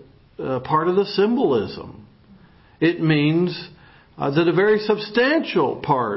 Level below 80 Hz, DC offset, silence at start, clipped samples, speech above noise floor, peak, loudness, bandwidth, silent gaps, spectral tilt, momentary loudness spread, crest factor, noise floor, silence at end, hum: -56 dBFS; under 0.1%; 0 s; under 0.1%; 30 dB; -4 dBFS; -20 LUFS; 5.8 kHz; none; -10.5 dB/octave; 13 LU; 16 dB; -50 dBFS; 0 s; none